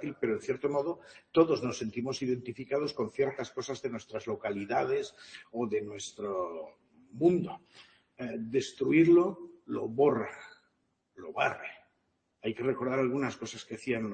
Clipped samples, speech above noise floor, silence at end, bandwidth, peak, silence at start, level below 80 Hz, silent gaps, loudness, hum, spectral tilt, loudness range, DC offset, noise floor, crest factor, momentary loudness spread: under 0.1%; 46 dB; 0 s; 8.8 kHz; -12 dBFS; 0 s; -70 dBFS; none; -32 LUFS; none; -6 dB/octave; 6 LU; under 0.1%; -77 dBFS; 20 dB; 15 LU